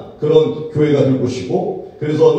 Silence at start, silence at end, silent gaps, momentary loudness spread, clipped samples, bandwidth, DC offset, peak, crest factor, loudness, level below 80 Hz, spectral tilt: 0 s; 0 s; none; 8 LU; under 0.1%; 8.4 kHz; under 0.1%; 0 dBFS; 14 dB; -16 LUFS; -52 dBFS; -7.5 dB/octave